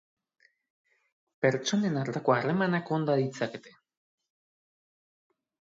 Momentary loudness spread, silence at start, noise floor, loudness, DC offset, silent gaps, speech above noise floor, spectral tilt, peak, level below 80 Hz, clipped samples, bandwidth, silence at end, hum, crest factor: 8 LU; 1.4 s; under -90 dBFS; -29 LUFS; under 0.1%; none; over 62 dB; -6 dB/octave; -10 dBFS; -76 dBFS; under 0.1%; 7.8 kHz; 2.1 s; none; 22 dB